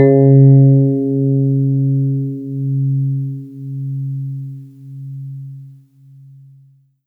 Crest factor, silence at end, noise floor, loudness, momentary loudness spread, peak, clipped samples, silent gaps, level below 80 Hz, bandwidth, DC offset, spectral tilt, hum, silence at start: 14 dB; 1.35 s; -49 dBFS; -14 LUFS; 23 LU; 0 dBFS; under 0.1%; none; -70 dBFS; 2.2 kHz; under 0.1%; -13.5 dB/octave; none; 0 s